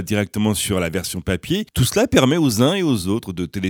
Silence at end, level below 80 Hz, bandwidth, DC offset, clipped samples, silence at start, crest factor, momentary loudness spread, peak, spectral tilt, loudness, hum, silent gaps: 0 s; -42 dBFS; 19.5 kHz; under 0.1%; under 0.1%; 0 s; 18 dB; 8 LU; -2 dBFS; -5 dB/octave; -19 LUFS; none; none